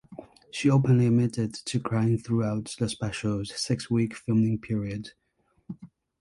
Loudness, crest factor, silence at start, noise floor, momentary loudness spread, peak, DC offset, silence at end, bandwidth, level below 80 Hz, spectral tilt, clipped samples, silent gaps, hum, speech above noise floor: -27 LUFS; 18 dB; 0.1 s; -47 dBFS; 22 LU; -10 dBFS; under 0.1%; 0.35 s; 11.5 kHz; -56 dBFS; -6.5 dB/octave; under 0.1%; none; none; 22 dB